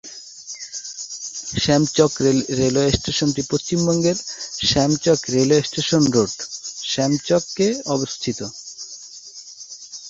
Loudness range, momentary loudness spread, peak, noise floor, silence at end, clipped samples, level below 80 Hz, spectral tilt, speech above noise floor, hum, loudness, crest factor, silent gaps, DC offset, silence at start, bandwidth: 5 LU; 17 LU; -2 dBFS; -40 dBFS; 0 s; under 0.1%; -46 dBFS; -4.5 dB/octave; 21 dB; none; -20 LUFS; 18 dB; none; under 0.1%; 0.05 s; 8 kHz